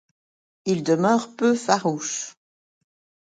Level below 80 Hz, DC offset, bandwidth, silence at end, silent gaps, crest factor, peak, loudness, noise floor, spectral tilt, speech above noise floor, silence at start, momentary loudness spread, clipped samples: -72 dBFS; under 0.1%; 9.4 kHz; 0.9 s; none; 20 dB; -4 dBFS; -23 LUFS; under -90 dBFS; -4.5 dB/octave; over 68 dB; 0.65 s; 11 LU; under 0.1%